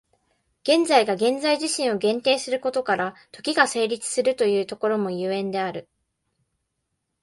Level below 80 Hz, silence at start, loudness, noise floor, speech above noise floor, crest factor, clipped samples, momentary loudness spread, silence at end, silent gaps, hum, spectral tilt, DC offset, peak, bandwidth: -70 dBFS; 0.65 s; -23 LUFS; -78 dBFS; 55 dB; 22 dB; under 0.1%; 8 LU; 1.4 s; none; none; -3 dB/octave; under 0.1%; -2 dBFS; 11.5 kHz